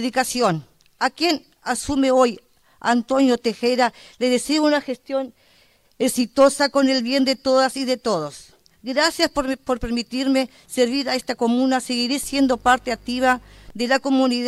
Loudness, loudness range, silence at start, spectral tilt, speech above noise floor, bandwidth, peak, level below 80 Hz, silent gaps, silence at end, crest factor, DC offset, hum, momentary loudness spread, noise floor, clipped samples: -20 LUFS; 2 LU; 0 s; -3.5 dB/octave; 37 dB; 14.5 kHz; -4 dBFS; -48 dBFS; none; 0 s; 16 dB; under 0.1%; none; 9 LU; -57 dBFS; under 0.1%